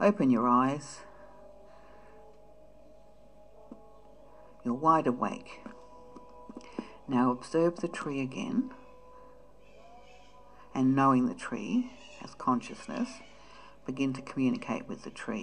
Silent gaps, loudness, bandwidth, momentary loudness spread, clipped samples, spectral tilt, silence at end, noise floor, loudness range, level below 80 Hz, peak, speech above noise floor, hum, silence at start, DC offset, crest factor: none; -30 LUFS; 10 kHz; 26 LU; under 0.1%; -6.5 dB/octave; 0 s; -58 dBFS; 4 LU; -64 dBFS; -12 dBFS; 28 dB; none; 0 s; 0.2%; 20 dB